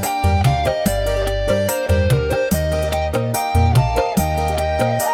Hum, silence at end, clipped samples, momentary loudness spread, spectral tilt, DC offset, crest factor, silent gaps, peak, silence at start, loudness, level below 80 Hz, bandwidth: none; 0 s; under 0.1%; 4 LU; -5.5 dB/octave; under 0.1%; 12 dB; none; -6 dBFS; 0 s; -18 LUFS; -28 dBFS; 18 kHz